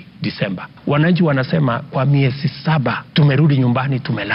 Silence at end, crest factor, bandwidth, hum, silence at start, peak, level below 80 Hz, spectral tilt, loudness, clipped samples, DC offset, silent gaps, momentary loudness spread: 0 s; 12 dB; 5.6 kHz; none; 0 s; -4 dBFS; -52 dBFS; -10.5 dB/octave; -17 LUFS; under 0.1%; under 0.1%; none; 8 LU